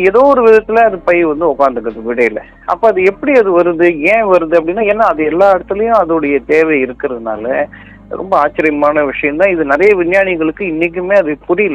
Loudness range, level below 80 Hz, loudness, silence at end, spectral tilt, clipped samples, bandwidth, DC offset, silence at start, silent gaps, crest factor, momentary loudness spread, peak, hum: 3 LU; -42 dBFS; -11 LUFS; 0 s; -7 dB/octave; 0.6%; 8.6 kHz; under 0.1%; 0 s; none; 12 dB; 9 LU; 0 dBFS; none